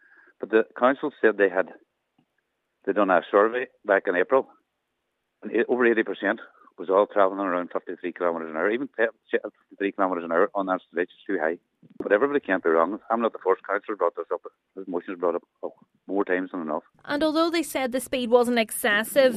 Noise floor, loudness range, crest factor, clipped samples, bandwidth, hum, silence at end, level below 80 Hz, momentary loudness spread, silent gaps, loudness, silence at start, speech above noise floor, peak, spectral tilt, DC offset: -78 dBFS; 4 LU; 20 dB; under 0.1%; 14 kHz; none; 0 s; -70 dBFS; 12 LU; none; -25 LUFS; 0.4 s; 54 dB; -6 dBFS; -4 dB/octave; under 0.1%